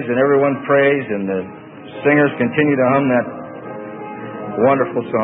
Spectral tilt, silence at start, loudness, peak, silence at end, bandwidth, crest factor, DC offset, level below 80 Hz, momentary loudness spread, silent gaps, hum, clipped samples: -12 dB/octave; 0 s; -16 LUFS; -2 dBFS; 0 s; 3.8 kHz; 16 dB; under 0.1%; -60 dBFS; 16 LU; none; none; under 0.1%